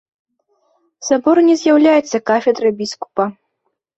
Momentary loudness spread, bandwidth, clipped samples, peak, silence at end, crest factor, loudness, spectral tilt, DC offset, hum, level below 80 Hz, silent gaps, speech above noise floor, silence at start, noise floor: 11 LU; 8 kHz; under 0.1%; -2 dBFS; 0.65 s; 14 dB; -15 LUFS; -4.5 dB/octave; under 0.1%; none; -62 dBFS; none; 58 dB; 1 s; -72 dBFS